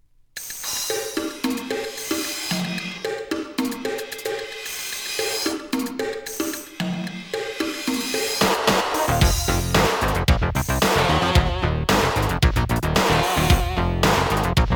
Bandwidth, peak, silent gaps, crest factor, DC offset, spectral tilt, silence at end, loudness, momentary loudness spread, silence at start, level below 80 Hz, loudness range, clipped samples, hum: over 20 kHz; -2 dBFS; none; 20 dB; under 0.1%; -4 dB/octave; 0 s; -22 LUFS; 10 LU; 0.35 s; -30 dBFS; 7 LU; under 0.1%; none